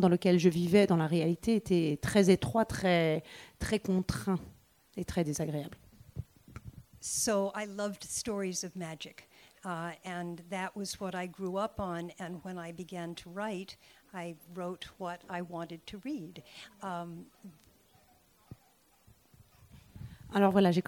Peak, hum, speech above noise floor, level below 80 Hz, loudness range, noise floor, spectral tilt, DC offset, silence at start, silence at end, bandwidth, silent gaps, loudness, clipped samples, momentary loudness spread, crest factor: -12 dBFS; none; 35 dB; -58 dBFS; 15 LU; -67 dBFS; -5.5 dB/octave; under 0.1%; 0 s; 0.05 s; 17 kHz; none; -33 LUFS; under 0.1%; 21 LU; 20 dB